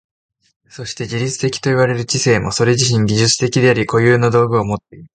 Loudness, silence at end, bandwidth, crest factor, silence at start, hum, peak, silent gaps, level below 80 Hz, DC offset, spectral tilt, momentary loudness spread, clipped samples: -15 LUFS; 0.1 s; 9.4 kHz; 16 dB; 0.75 s; none; 0 dBFS; none; -46 dBFS; under 0.1%; -4.5 dB/octave; 10 LU; under 0.1%